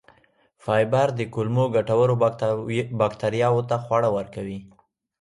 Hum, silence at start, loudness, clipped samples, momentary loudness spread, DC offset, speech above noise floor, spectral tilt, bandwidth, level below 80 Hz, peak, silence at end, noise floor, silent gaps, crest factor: none; 0.65 s; -23 LUFS; under 0.1%; 11 LU; under 0.1%; 39 dB; -7.5 dB/octave; 11.5 kHz; -58 dBFS; -8 dBFS; 0.55 s; -61 dBFS; none; 16 dB